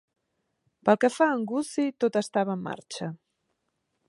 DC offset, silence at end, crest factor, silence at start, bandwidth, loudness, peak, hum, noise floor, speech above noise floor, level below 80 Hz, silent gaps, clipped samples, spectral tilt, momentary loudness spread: under 0.1%; 0.95 s; 22 dB; 0.85 s; 11.5 kHz; -27 LUFS; -6 dBFS; none; -78 dBFS; 52 dB; -76 dBFS; none; under 0.1%; -5.5 dB/octave; 13 LU